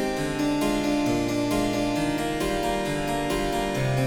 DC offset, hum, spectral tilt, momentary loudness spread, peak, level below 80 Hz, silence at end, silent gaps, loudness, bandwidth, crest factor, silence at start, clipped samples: under 0.1%; none; -5 dB/octave; 2 LU; -12 dBFS; -40 dBFS; 0 s; none; -25 LUFS; 18 kHz; 12 dB; 0 s; under 0.1%